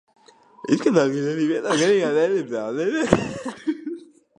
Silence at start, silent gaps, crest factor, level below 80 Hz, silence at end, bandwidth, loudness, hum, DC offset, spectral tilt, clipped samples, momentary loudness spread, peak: 0.65 s; none; 22 dB; -50 dBFS; 0.35 s; 11 kHz; -22 LUFS; none; under 0.1%; -5 dB/octave; under 0.1%; 12 LU; 0 dBFS